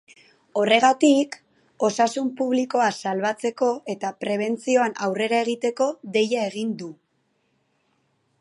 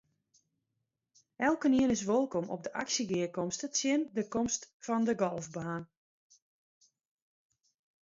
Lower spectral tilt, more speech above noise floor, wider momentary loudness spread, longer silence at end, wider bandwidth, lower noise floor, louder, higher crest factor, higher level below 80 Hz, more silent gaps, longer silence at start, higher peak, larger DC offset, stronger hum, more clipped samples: about the same, -4 dB/octave vs -4 dB/octave; second, 48 dB vs 53 dB; about the same, 12 LU vs 10 LU; second, 1.45 s vs 2.15 s; first, 11.5 kHz vs 7.8 kHz; second, -70 dBFS vs -85 dBFS; first, -23 LUFS vs -32 LUFS; about the same, 22 dB vs 18 dB; second, -78 dBFS vs -68 dBFS; second, none vs 4.73-4.80 s; second, 0.55 s vs 1.4 s; first, -2 dBFS vs -16 dBFS; neither; neither; neither